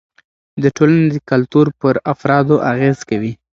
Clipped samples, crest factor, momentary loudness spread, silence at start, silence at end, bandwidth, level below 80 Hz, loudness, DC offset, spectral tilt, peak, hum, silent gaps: under 0.1%; 14 dB; 7 LU; 0.55 s; 0.2 s; 7.6 kHz; -52 dBFS; -15 LUFS; under 0.1%; -8 dB/octave; 0 dBFS; none; none